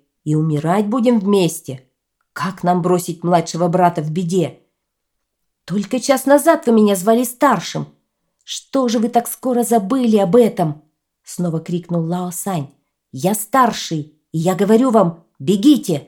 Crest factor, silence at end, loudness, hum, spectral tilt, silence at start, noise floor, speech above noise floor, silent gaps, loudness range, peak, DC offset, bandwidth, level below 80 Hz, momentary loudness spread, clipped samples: 16 dB; 0.05 s; -17 LUFS; none; -6 dB/octave; 0.25 s; -75 dBFS; 59 dB; none; 4 LU; 0 dBFS; under 0.1%; 18.5 kHz; -64 dBFS; 13 LU; under 0.1%